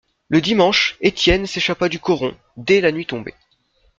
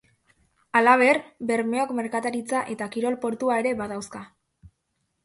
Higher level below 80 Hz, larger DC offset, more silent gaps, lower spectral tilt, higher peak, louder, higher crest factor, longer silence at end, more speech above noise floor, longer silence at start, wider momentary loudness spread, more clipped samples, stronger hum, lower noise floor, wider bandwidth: first, -38 dBFS vs -64 dBFS; neither; neither; about the same, -4.5 dB/octave vs -4.5 dB/octave; about the same, -2 dBFS vs -4 dBFS; first, -17 LUFS vs -24 LUFS; about the same, 18 dB vs 22 dB; second, 0.7 s vs 1 s; second, 43 dB vs 52 dB; second, 0.3 s vs 0.75 s; about the same, 13 LU vs 13 LU; neither; neither; second, -60 dBFS vs -76 dBFS; second, 7.6 kHz vs 11.5 kHz